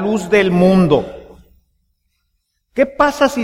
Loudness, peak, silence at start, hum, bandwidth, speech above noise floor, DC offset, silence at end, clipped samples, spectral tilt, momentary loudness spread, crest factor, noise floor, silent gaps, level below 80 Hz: -14 LUFS; 0 dBFS; 0 s; none; 14.5 kHz; 55 dB; under 0.1%; 0 s; under 0.1%; -6.5 dB/octave; 9 LU; 16 dB; -68 dBFS; none; -42 dBFS